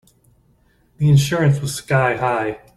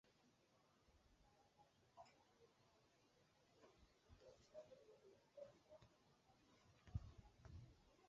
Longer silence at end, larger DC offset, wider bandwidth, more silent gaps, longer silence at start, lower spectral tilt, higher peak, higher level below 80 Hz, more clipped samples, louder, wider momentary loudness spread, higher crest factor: first, 0.2 s vs 0 s; neither; first, 13 kHz vs 7.4 kHz; neither; first, 1 s vs 0.05 s; about the same, -6 dB/octave vs -6.5 dB/octave; first, -4 dBFS vs -38 dBFS; first, -48 dBFS vs -72 dBFS; neither; first, -18 LUFS vs -63 LUFS; second, 7 LU vs 13 LU; second, 16 dB vs 28 dB